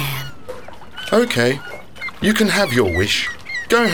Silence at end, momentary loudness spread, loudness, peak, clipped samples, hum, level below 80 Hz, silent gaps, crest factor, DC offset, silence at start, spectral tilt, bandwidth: 0 s; 19 LU; -18 LUFS; -2 dBFS; under 0.1%; none; -44 dBFS; none; 16 dB; 2%; 0 s; -4 dB/octave; over 20 kHz